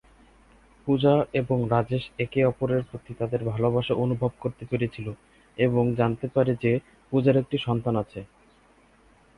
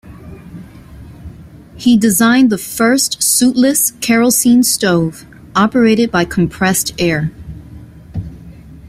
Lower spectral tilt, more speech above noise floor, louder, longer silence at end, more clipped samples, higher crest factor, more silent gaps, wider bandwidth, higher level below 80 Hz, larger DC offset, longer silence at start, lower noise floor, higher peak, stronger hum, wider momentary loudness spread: first, -9 dB/octave vs -4 dB/octave; first, 34 dB vs 24 dB; second, -25 LUFS vs -12 LUFS; first, 1.15 s vs 0 s; neither; about the same, 18 dB vs 14 dB; neither; second, 10.5 kHz vs 16 kHz; second, -54 dBFS vs -40 dBFS; neither; first, 0.85 s vs 0.05 s; first, -58 dBFS vs -36 dBFS; second, -8 dBFS vs 0 dBFS; neither; second, 13 LU vs 18 LU